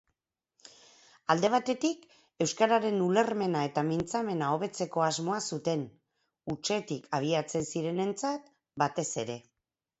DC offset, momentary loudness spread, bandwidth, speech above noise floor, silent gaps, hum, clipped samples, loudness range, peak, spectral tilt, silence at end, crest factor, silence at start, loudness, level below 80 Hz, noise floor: under 0.1%; 13 LU; 8.2 kHz; 53 dB; none; none; under 0.1%; 4 LU; -10 dBFS; -4.5 dB/octave; 0.6 s; 22 dB; 0.65 s; -31 LUFS; -68 dBFS; -83 dBFS